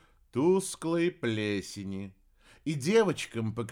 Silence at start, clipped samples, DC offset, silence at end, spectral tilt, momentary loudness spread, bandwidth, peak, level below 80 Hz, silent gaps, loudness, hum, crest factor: 0.35 s; under 0.1%; under 0.1%; 0 s; -5.5 dB/octave; 14 LU; 16.5 kHz; -14 dBFS; -64 dBFS; none; -30 LUFS; none; 16 dB